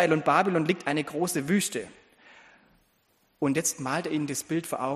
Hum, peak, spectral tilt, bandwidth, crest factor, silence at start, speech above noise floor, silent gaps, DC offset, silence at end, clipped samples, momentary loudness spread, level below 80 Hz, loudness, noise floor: none; -8 dBFS; -4.5 dB/octave; 15 kHz; 20 dB; 0 s; 41 dB; none; under 0.1%; 0 s; under 0.1%; 8 LU; -70 dBFS; -27 LUFS; -68 dBFS